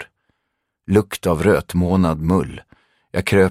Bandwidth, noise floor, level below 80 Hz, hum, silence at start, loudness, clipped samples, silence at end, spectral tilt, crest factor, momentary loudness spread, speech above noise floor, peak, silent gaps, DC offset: 15.5 kHz; -75 dBFS; -40 dBFS; none; 0 s; -18 LUFS; under 0.1%; 0 s; -7 dB/octave; 18 dB; 18 LU; 58 dB; -2 dBFS; none; under 0.1%